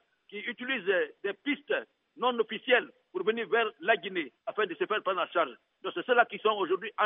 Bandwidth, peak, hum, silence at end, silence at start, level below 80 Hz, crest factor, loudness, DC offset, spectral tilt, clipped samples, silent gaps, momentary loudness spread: 3.9 kHz; -10 dBFS; none; 0 s; 0.3 s; under -90 dBFS; 22 dB; -30 LUFS; under 0.1%; -0.5 dB/octave; under 0.1%; none; 10 LU